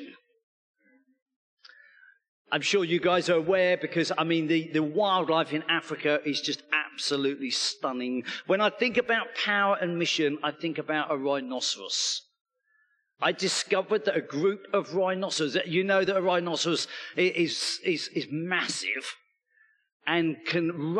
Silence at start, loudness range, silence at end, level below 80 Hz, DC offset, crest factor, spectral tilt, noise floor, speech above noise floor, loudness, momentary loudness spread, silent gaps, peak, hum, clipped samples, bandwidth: 0 s; 4 LU; 0 s; -78 dBFS; under 0.1%; 18 dB; -3.5 dB/octave; -70 dBFS; 43 dB; -27 LUFS; 6 LU; 0.43-0.74 s, 1.22-1.26 s, 1.36-1.57 s, 2.28-2.45 s, 12.41-12.45 s, 19.92-20.00 s; -10 dBFS; none; under 0.1%; 11.5 kHz